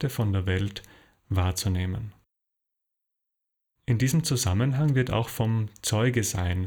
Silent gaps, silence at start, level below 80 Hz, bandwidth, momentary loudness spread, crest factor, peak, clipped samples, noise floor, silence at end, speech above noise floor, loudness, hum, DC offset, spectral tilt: none; 0 s; -46 dBFS; 19.5 kHz; 9 LU; 14 dB; -12 dBFS; under 0.1%; -83 dBFS; 0 s; 58 dB; -26 LUFS; none; under 0.1%; -5.5 dB/octave